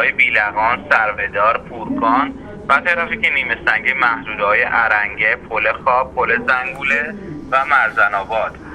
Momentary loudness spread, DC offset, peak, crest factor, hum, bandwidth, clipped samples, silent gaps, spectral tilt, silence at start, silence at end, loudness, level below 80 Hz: 6 LU; under 0.1%; 0 dBFS; 16 dB; none; 11 kHz; under 0.1%; none; -5 dB/octave; 0 s; 0 s; -16 LUFS; -44 dBFS